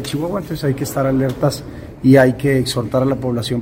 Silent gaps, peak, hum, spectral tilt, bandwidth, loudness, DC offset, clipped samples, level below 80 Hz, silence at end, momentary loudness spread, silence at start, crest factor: none; 0 dBFS; none; -6.5 dB/octave; 16 kHz; -17 LUFS; under 0.1%; under 0.1%; -42 dBFS; 0 s; 10 LU; 0 s; 16 dB